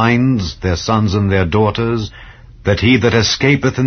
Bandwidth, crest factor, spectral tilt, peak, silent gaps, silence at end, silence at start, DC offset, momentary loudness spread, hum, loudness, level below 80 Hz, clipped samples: 6.6 kHz; 14 dB; -5.5 dB/octave; 0 dBFS; none; 0 s; 0 s; under 0.1%; 7 LU; none; -14 LUFS; -34 dBFS; under 0.1%